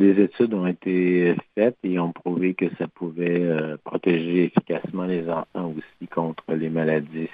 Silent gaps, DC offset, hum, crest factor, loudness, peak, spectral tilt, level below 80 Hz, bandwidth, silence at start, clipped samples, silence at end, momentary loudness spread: none; under 0.1%; none; 18 dB; -24 LUFS; -4 dBFS; -11 dB/octave; -68 dBFS; 4.8 kHz; 0 s; under 0.1%; 0 s; 9 LU